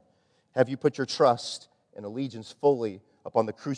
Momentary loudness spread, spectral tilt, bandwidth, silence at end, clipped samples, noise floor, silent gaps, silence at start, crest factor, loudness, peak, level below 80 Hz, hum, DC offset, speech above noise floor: 15 LU; -5.5 dB/octave; 10.5 kHz; 0 s; under 0.1%; -68 dBFS; none; 0.55 s; 20 dB; -27 LUFS; -8 dBFS; -78 dBFS; none; under 0.1%; 41 dB